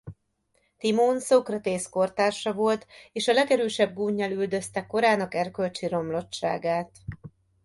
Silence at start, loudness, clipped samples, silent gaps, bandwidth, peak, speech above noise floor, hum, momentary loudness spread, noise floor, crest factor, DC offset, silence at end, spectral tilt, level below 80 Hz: 0.05 s; -26 LUFS; under 0.1%; none; 11.5 kHz; -8 dBFS; 46 dB; none; 8 LU; -72 dBFS; 18 dB; under 0.1%; 0.35 s; -4.5 dB/octave; -60 dBFS